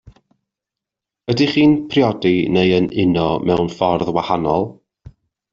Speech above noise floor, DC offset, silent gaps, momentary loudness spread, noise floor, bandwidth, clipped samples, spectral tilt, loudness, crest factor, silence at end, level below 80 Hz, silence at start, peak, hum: 69 dB; under 0.1%; none; 6 LU; -85 dBFS; 7.4 kHz; under 0.1%; -7 dB/octave; -17 LUFS; 16 dB; 0.4 s; -48 dBFS; 1.3 s; -2 dBFS; none